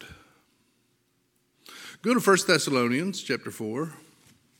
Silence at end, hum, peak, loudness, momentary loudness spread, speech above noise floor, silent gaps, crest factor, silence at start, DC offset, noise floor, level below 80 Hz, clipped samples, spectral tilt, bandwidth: 0.65 s; none; -6 dBFS; -25 LUFS; 23 LU; 46 dB; none; 22 dB; 0 s; under 0.1%; -71 dBFS; -70 dBFS; under 0.1%; -4 dB/octave; 17 kHz